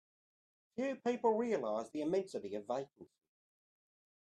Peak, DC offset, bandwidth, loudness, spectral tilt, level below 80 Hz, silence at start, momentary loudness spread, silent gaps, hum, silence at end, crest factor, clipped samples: -20 dBFS; under 0.1%; 11.5 kHz; -38 LUFS; -6 dB/octave; -86 dBFS; 0.75 s; 10 LU; none; none; 1.35 s; 20 dB; under 0.1%